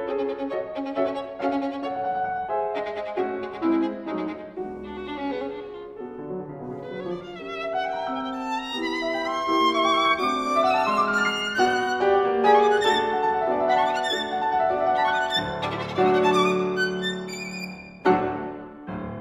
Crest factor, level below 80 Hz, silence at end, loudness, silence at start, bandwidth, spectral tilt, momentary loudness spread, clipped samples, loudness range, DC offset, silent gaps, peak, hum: 18 dB; -56 dBFS; 0 s; -24 LUFS; 0 s; 15 kHz; -4.5 dB/octave; 14 LU; under 0.1%; 10 LU; under 0.1%; none; -6 dBFS; none